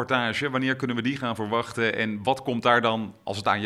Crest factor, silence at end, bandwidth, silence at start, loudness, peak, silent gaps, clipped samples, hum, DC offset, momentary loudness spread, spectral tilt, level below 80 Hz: 20 dB; 0 s; 13 kHz; 0 s; -25 LUFS; -4 dBFS; none; under 0.1%; none; under 0.1%; 7 LU; -5.5 dB/octave; -64 dBFS